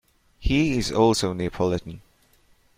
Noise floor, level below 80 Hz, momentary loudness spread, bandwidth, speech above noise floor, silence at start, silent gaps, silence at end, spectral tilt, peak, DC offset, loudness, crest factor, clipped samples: -60 dBFS; -36 dBFS; 11 LU; 16 kHz; 37 dB; 0.4 s; none; 0.8 s; -5.5 dB/octave; -6 dBFS; under 0.1%; -23 LUFS; 18 dB; under 0.1%